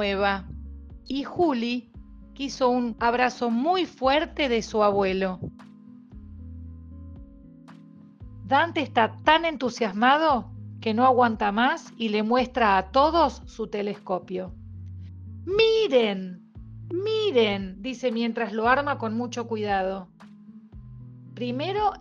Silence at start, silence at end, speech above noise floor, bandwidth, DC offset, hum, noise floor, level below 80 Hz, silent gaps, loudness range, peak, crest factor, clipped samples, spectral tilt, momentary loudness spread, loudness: 0 s; 0 s; 25 dB; 7.6 kHz; under 0.1%; none; -48 dBFS; -48 dBFS; none; 6 LU; -4 dBFS; 20 dB; under 0.1%; -5.5 dB/octave; 22 LU; -24 LUFS